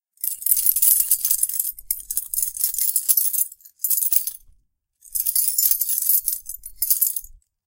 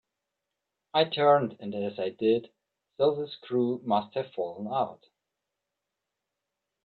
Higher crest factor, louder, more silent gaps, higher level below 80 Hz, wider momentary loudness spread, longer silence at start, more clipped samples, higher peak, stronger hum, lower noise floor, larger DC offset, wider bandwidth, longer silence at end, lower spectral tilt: about the same, 22 dB vs 20 dB; first, -18 LUFS vs -28 LUFS; neither; first, -56 dBFS vs -76 dBFS; about the same, 12 LU vs 12 LU; second, 0.25 s vs 0.95 s; neither; first, 0 dBFS vs -10 dBFS; neither; second, -62 dBFS vs -86 dBFS; neither; first, 18 kHz vs 4.8 kHz; second, 0.3 s vs 1.9 s; second, 3.5 dB/octave vs -8.5 dB/octave